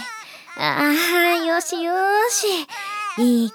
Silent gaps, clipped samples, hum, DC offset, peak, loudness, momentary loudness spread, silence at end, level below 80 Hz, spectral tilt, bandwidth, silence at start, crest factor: none; under 0.1%; none; under 0.1%; -4 dBFS; -19 LUFS; 11 LU; 0 s; -80 dBFS; -2 dB/octave; over 20 kHz; 0 s; 18 dB